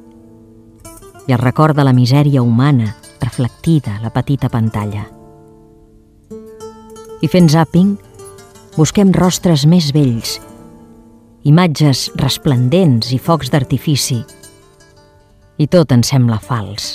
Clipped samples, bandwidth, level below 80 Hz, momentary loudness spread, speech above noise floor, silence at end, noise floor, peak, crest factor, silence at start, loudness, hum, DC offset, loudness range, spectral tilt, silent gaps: under 0.1%; 15 kHz; -42 dBFS; 15 LU; 35 dB; 0 s; -47 dBFS; 0 dBFS; 14 dB; 0.85 s; -13 LUFS; none; under 0.1%; 6 LU; -6 dB/octave; none